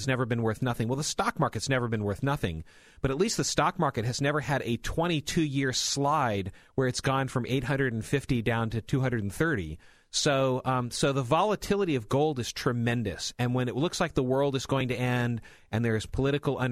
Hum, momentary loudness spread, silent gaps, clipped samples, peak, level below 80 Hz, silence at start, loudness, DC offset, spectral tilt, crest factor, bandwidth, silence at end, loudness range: none; 5 LU; none; under 0.1%; -10 dBFS; -50 dBFS; 0 s; -28 LUFS; under 0.1%; -5 dB/octave; 18 dB; 15.5 kHz; 0 s; 1 LU